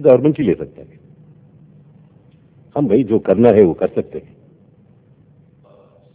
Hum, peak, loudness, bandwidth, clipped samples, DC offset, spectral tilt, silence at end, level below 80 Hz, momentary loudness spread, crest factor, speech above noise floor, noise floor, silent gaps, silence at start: none; 0 dBFS; -15 LUFS; 4 kHz; under 0.1%; under 0.1%; -12.5 dB/octave; 1.95 s; -50 dBFS; 18 LU; 18 dB; 35 dB; -50 dBFS; none; 0 s